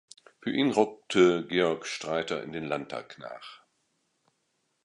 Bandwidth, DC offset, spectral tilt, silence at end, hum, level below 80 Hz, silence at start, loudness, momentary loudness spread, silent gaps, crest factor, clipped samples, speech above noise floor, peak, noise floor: 11 kHz; under 0.1%; -5 dB/octave; 1.3 s; none; -68 dBFS; 0.45 s; -28 LUFS; 19 LU; none; 22 dB; under 0.1%; 48 dB; -8 dBFS; -76 dBFS